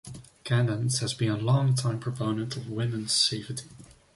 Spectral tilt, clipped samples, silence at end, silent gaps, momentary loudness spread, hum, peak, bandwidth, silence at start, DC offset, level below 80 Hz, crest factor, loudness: -4.5 dB/octave; under 0.1%; 0.25 s; none; 13 LU; none; -10 dBFS; 11.5 kHz; 0.05 s; under 0.1%; -60 dBFS; 18 dB; -27 LUFS